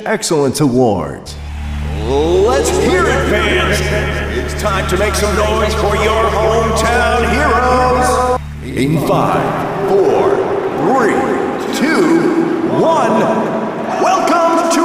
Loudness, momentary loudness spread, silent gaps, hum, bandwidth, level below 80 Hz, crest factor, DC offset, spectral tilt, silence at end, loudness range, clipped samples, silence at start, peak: -13 LUFS; 7 LU; none; none; 16 kHz; -26 dBFS; 10 dB; under 0.1%; -5 dB/octave; 0 s; 1 LU; under 0.1%; 0 s; -2 dBFS